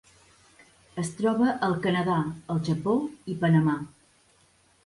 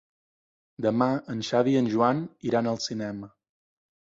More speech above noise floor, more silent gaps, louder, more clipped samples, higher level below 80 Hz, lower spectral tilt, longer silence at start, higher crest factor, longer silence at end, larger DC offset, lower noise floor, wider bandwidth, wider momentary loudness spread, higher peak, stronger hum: second, 37 dB vs over 64 dB; neither; about the same, -26 LUFS vs -26 LUFS; neither; about the same, -62 dBFS vs -66 dBFS; about the same, -7 dB/octave vs -6 dB/octave; first, 0.95 s vs 0.8 s; about the same, 16 dB vs 18 dB; first, 1 s vs 0.85 s; neither; second, -63 dBFS vs under -90 dBFS; first, 11.5 kHz vs 7.8 kHz; about the same, 11 LU vs 9 LU; about the same, -12 dBFS vs -10 dBFS; neither